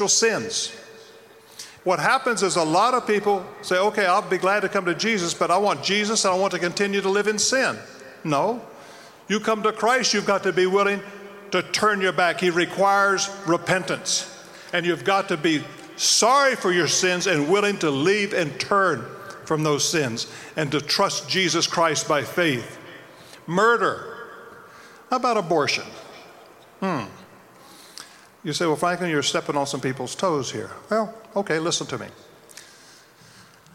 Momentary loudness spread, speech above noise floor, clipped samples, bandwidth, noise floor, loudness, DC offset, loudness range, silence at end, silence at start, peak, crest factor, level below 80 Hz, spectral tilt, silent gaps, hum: 16 LU; 28 dB; under 0.1%; 16.5 kHz; -50 dBFS; -22 LUFS; under 0.1%; 7 LU; 0.3 s; 0 s; -6 dBFS; 16 dB; -66 dBFS; -3 dB/octave; none; none